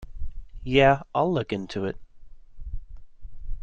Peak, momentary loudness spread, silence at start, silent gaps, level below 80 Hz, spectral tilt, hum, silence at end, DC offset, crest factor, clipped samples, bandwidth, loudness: -6 dBFS; 24 LU; 0 s; none; -38 dBFS; -7 dB/octave; none; 0 s; under 0.1%; 20 dB; under 0.1%; 8.2 kHz; -24 LUFS